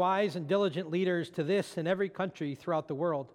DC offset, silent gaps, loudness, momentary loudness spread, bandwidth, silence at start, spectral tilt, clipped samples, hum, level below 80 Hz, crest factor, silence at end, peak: under 0.1%; none; -32 LUFS; 4 LU; 13 kHz; 0 s; -6.5 dB/octave; under 0.1%; none; -78 dBFS; 16 dB; 0.05 s; -16 dBFS